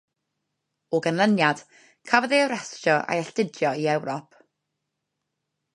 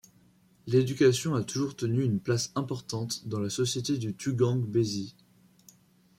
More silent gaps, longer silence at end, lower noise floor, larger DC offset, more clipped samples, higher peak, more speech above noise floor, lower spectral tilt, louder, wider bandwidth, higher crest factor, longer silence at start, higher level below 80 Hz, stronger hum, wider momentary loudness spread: neither; first, 1.55 s vs 1.1 s; first, -81 dBFS vs -62 dBFS; neither; neither; first, -2 dBFS vs -10 dBFS; first, 57 dB vs 34 dB; about the same, -5 dB/octave vs -5.5 dB/octave; first, -24 LUFS vs -29 LUFS; second, 11.5 kHz vs 15.5 kHz; first, 24 dB vs 18 dB; first, 0.9 s vs 0.65 s; second, -76 dBFS vs -66 dBFS; neither; about the same, 9 LU vs 10 LU